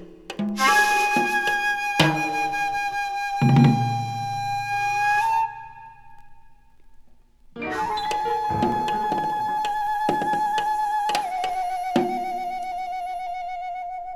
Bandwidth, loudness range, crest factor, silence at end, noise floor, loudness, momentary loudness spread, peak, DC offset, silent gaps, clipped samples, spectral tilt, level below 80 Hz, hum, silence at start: 17 kHz; 6 LU; 22 dB; 0 s; -50 dBFS; -23 LUFS; 11 LU; -2 dBFS; under 0.1%; none; under 0.1%; -5 dB/octave; -52 dBFS; none; 0 s